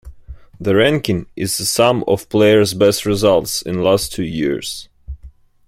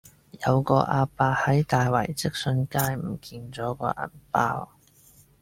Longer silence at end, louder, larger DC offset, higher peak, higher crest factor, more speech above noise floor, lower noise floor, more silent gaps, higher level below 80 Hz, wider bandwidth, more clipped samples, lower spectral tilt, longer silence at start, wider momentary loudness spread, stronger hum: second, 0.4 s vs 0.75 s; first, -16 LUFS vs -25 LUFS; neither; about the same, -2 dBFS vs -4 dBFS; second, 16 dB vs 22 dB; second, 26 dB vs 31 dB; second, -42 dBFS vs -56 dBFS; neither; first, -42 dBFS vs -54 dBFS; about the same, 16.5 kHz vs 16.5 kHz; neither; second, -4.5 dB/octave vs -6 dB/octave; second, 0.05 s vs 0.35 s; about the same, 15 LU vs 13 LU; neither